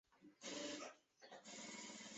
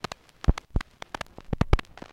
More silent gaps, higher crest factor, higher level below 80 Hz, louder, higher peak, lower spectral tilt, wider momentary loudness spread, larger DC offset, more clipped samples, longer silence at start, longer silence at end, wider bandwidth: neither; second, 16 dB vs 26 dB; second, under -90 dBFS vs -32 dBFS; second, -53 LUFS vs -31 LUFS; second, -38 dBFS vs -4 dBFS; second, -1.5 dB/octave vs -6.5 dB/octave; about the same, 13 LU vs 12 LU; neither; neither; second, 0.1 s vs 0.5 s; second, 0 s vs 0.3 s; second, 8.2 kHz vs 12.5 kHz